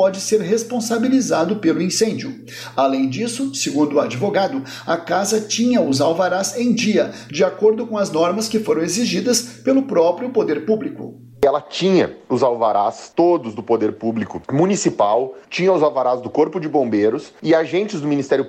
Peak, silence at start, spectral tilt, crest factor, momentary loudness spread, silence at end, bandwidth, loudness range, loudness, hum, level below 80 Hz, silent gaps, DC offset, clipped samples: -4 dBFS; 0 s; -4.5 dB/octave; 14 dB; 6 LU; 0 s; 15.5 kHz; 1 LU; -18 LUFS; none; -60 dBFS; none; under 0.1%; under 0.1%